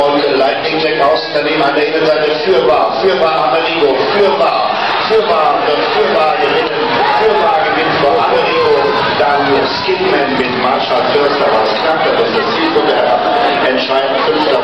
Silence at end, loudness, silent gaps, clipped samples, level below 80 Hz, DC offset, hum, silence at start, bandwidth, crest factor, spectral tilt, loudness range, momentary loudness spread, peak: 0 s; -11 LUFS; none; under 0.1%; -48 dBFS; 0.4%; none; 0 s; 9.2 kHz; 10 dB; -5 dB/octave; 1 LU; 2 LU; -2 dBFS